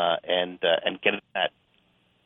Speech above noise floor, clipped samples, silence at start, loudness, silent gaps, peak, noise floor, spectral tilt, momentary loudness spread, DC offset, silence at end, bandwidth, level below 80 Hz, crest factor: 39 dB; under 0.1%; 0 s; -26 LUFS; none; -4 dBFS; -66 dBFS; -7 dB/octave; 5 LU; under 0.1%; 0.75 s; 3.9 kHz; -76 dBFS; 24 dB